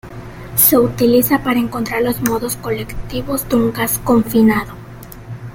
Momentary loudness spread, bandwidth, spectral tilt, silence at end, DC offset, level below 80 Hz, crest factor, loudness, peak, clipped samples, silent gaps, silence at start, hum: 21 LU; 17 kHz; -4.5 dB/octave; 0 s; under 0.1%; -36 dBFS; 16 dB; -15 LUFS; 0 dBFS; under 0.1%; none; 0.05 s; none